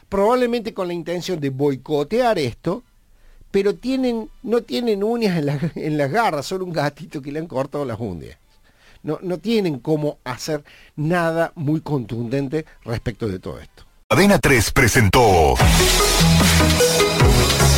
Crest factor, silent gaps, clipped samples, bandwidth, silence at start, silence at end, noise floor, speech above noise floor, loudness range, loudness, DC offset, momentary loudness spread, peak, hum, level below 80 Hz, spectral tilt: 16 dB; 14.04-14.10 s; under 0.1%; 17 kHz; 0.1 s; 0 s; -52 dBFS; 33 dB; 11 LU; -19 LUFS; under 0.1%; 14 LU; -2 dBFS; none; -30 dBFS; -4.5 dB/octave